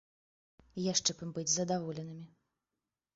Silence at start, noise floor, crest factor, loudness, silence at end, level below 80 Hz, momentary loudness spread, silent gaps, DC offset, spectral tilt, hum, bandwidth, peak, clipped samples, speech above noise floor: 0.75 s; under -90 dBFS; 22 dB; -34 LUFS; 0.9 s; -72 dBFS; 17 LU; none; under 0.1%; -4.5 dB/octave; none; 7.6 kHz; -16 dBFS; under 0.1%; over 55 dB